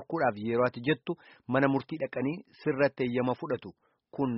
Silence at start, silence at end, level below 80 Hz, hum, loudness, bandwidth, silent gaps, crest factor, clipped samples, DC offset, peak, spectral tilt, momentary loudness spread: 0 s; 0 s; -68 dBFS; none; -31 LUFS; 5.8 kHz; none; 20 dB; under 0.1%; under 0.1%; -10 dBFS; -5.5 dB/octave; 9 LU